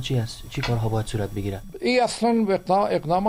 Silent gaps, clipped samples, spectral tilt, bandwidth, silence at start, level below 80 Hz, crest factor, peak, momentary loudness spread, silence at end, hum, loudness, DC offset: none; under 0.1%; -6 dB/octave; 15.5 kHz; 0 s; -42 dBFS; 16 dB; -8 dBFS; 8 LU; 0 s; none; -24 LUFS; under 0.1%